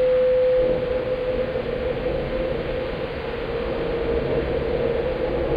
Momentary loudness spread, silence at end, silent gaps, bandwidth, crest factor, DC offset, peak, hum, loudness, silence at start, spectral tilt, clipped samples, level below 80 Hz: 8 LU; 0 s; none; 5.2 kHz; 12 dB; under 0.1%; -10 dBFS; none; -24 LUFS; 0 s; -8.5 dB/octave; under 0.1%; -36 dBFS